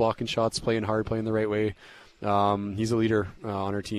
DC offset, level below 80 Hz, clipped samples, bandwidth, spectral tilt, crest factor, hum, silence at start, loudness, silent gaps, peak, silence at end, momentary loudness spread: under 0.1%; -52 dBFS; under 0.1%; 13 kHz; -6 dB/octave; 16 dB; none; 0 s; -27 LUFS; none; -12 dBFS; 0 s; 7 LU